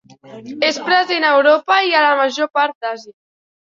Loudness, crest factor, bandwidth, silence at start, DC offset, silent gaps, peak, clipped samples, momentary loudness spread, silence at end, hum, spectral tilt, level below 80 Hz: -15 LUFS; 16 dB; 7.6 kHz; 0.25 s; under 0.1%; 2.75-2.81 s; -2 dBFS; under 0.1%; 13 LU; 0.5 s; none; -2 dB/octave; -72 dBFS